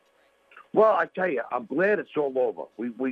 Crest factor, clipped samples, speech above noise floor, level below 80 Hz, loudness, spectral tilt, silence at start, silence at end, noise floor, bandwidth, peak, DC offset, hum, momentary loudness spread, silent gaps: 18 dB; under 0.1%; 39 dB; -78 dBFS; -25 LUFS; -8 dB/octave; 0.55 s; 0 s; -64 dBFS; 5.8 kHz; -8 dBFS; under 0.1%; none; 10 LU; none